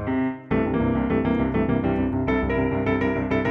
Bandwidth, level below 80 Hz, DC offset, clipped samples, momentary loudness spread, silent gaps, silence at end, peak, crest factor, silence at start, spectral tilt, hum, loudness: 6 kHz; -36 dBFS; under 0.1%; under 0.1%; 3 LU; none; 0 s; -10 dBFS; 12 dB; 0 s; -9.5 dB/octave; none; -23 LUFS